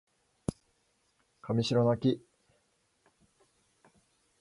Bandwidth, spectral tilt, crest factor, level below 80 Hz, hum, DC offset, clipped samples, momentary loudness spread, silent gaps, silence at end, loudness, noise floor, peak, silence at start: 11.5 kHz; -7 dB/octave; 20 dB; -62 dBFS; none; under 0.1%; under 0.1%; 13 LU; none; 2.2 s; -31 LUFS; -74 dBFS; -16 dBFS; 0.5 s